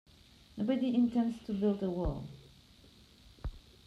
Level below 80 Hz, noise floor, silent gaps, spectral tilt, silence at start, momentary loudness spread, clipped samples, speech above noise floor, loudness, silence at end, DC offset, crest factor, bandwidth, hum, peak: -50 dBFS; -60 dBFS; none; -8 dB/octave; 0.55 s; 19 LU; under 0.1%; 28 dB; -33 LUFS; 0.3 s; under 0.1%; 16 dB; 9.6 kHz; none; -20 dBFS